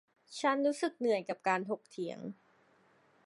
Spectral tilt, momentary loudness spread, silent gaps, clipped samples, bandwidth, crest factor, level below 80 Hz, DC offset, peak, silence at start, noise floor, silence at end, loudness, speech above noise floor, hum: -4.5 dB/octave; 14 LU; none; under 0.1%; 11.5 kHz; 20 dB; under -90 dBFS; under 0.1%; -16 dBFS; 0.3 s; -68 dBFS; 0.9 s; -34 LUFS; 34 dB; none